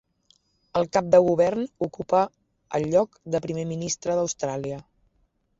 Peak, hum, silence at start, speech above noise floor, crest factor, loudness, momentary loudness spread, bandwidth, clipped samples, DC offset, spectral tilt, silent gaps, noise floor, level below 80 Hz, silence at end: -6 dBFS; none; 0.75 s; 45 dB; 20 dB; -25 LUFS; 12 LU; 7.8 kHz; under 0.1%; under 0.1%; -5.5 dB/octave; none; -69 dBFS; -60 dBFS; 0.8 s